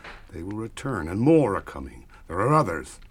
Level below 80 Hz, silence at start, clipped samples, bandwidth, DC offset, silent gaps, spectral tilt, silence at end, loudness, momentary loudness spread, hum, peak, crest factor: -46 dBFS; 0.05 s; under 0.1%; 14 kHz; under 0.1%; none; -7.5 dB/octave; 0.05 s; -24 LUFS; 19 LU; none; -6 dBFS; 20 dB